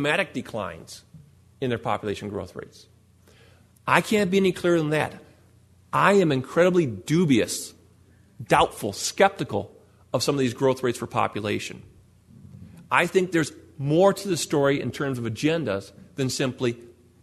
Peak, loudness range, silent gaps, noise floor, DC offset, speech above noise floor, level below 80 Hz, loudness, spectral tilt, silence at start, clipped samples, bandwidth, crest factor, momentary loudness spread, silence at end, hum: -2 dBFS; 5 LU; none; -56 dBFS; under 0.1%; 32 dB; -58 dBFS; -24 LUFS; -5 dB/octave; 0 s; under 0.1%; 13.5 kHz; 24 dB; 14 LU; 0.3 s; none